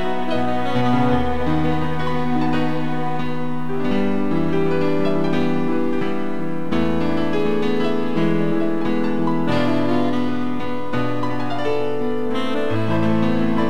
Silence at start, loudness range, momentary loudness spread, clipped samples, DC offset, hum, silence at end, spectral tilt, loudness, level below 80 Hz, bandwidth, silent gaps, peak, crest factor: 0 s; 2 LU; 5 LU; under 0.1%; 10%; none; 0 s; -7.5 dB/octave; -21 LUFS; -44 dBFS; 13.5 kHz; none; -6 dBFS; 14 dB